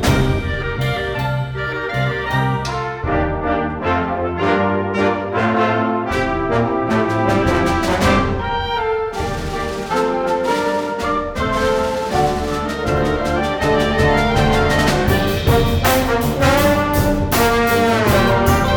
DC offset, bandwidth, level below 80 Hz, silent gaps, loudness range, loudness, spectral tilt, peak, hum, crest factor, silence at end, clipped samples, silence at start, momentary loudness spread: under 0.1%; over 20 kHz; -30 dBFS; none; 5 LU; -17 LUFS; -5.5 dB/octave; -2 dBFS; none; 16 dB; 0 s; under 0.1%; 0 s; 6 LU